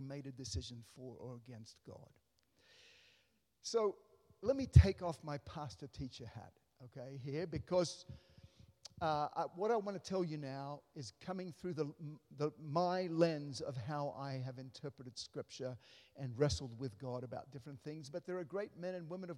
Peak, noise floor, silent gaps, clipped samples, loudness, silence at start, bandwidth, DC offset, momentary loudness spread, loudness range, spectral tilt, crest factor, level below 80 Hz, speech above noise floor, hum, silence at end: -12 dBFS; -77 dBFS; none; under 0.1%; -40 LUFS; 0 s; 11 kHz; under 0.1%; 17 LU; 9 LU; -6.5 dB/octave; 30 dB; -54 dBFS; 37 dB; none; 0 s